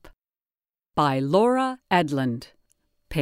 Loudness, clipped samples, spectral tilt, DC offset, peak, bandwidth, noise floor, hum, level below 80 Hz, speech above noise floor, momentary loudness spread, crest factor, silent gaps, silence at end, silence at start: -23 LUFS; under 0.1%; -6.5 dB/octave; under 0.1%; -6 dBFS; 16 kHz; under -90 dBFS; none; -52 dBFS; over 68 dB; 11 LU; 20 dB; none; 0 s; 0.05 s